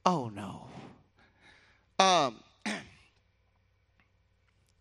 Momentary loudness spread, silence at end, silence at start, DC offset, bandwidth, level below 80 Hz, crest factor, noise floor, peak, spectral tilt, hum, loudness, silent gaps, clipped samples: 23 LU; 1.95 s; 0.05 s; under 0.1%; 12 kHz; -72 dBFS; 28 dB; -71 dBFS; -6 dBFS; -3.5 dB/octave; none; -30 LUFS; none; under 0.1%